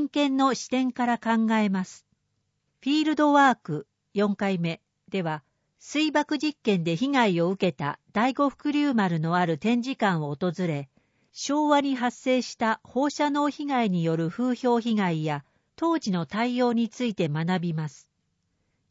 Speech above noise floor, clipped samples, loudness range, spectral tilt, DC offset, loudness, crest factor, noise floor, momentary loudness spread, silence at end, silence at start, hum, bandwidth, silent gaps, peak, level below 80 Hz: 51 dB; under 0.1%; 2 LU; -6 dB/octave; under 0.1%; -26 LUFS; 18 dB; -76 dBFS; 9 LU; 1 s; 0 s; none; 8 kHz; none; -8 dBFS; -70 dBFS